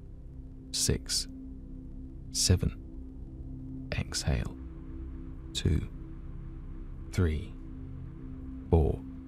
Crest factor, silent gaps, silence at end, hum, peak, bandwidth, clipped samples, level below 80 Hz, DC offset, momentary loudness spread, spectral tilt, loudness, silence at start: 22 dB; none; 0 s; none; -12 dBFS; 16 kHz; under 0.1%; -40 dBFS; under 0.1%; 18 LU; -4.5 dB/octave; -32 LUFS; 0 s